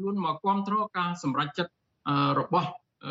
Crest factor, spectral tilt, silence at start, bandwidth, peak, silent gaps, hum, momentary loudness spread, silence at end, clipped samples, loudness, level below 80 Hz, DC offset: 16 dB; -4.5 dB/octave; 0 s; 7.8 kHz; -12 dBFS; none; none; 11 LU; 0 s; under 0.1%; -28 LUFS; -70 dBFS; under 0.1%